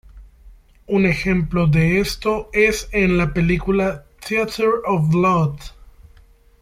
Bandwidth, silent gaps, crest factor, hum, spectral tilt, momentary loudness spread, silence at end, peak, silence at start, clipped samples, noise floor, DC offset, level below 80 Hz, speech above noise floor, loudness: 15.5 kHz; none; 16 dB; none; -6.5 dB/octave; 6 LU; 0.9 s; -4 dBFS; 0.15 s; under 0.1%; -50 dBFS; under 0.1%; -36 dBFS; 32 dB; -18 LUFS